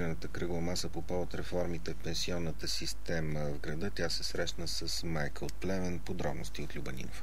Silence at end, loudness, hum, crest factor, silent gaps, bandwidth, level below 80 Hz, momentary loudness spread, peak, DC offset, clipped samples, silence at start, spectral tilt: 0 s; -37 LUFS; none; 16 dB; none; 16 kHz; -46 dBFS; 5 LU; -18 dBFS; 2%; under 0.1%; 0 s; -4.5 dB/octave